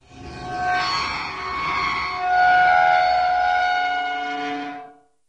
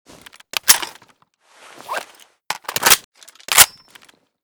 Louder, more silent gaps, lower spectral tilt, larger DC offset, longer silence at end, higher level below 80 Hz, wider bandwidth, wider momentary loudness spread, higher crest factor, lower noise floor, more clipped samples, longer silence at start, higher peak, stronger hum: second, -20 LUFS vs -14 LUFS; second, none vs 3.04-3.12 s; first, -3 dB/octave vs 1.5 dB/octave; neither; second, 0.4 s vs 0.75 s; first, -48 dBFS vs -54 dBFS; second, 8.6 kHz vs over 20 kHz; second, 15 LU vs 18 LU; second, 14 dB vs 20 dB; second, -44 dBFS vs -56 dBFS; second, under 0.1% vs 0.1%; second, 0.1 s vs 0.65 s; second, -6 dBFS vs 0 dBFS; neither